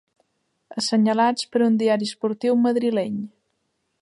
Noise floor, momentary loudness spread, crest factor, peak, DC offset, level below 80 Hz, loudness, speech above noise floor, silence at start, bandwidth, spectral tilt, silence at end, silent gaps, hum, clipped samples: -73 dBFS; 10 LU; 16 dB; -8 dBFS; under 0.1%; -74 dBFS; -21 LUFS; 53 dB; 0.7 s; 11.5 kHz; -5 dB/octave; 0.75 s; none; none; under 0.1%